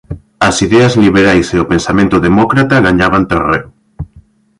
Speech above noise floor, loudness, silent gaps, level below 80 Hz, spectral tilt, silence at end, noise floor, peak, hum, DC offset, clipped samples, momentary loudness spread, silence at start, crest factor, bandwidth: 34 dB; -10 LUFS; none; -32 dBFS; -5.5 dB/octave; 0.55 s; -43 dBFS; 0 dBFS; none; under 0.1%; under 0.1%; 21 LU; 0.1 s; 10 dB; 11.5 kHz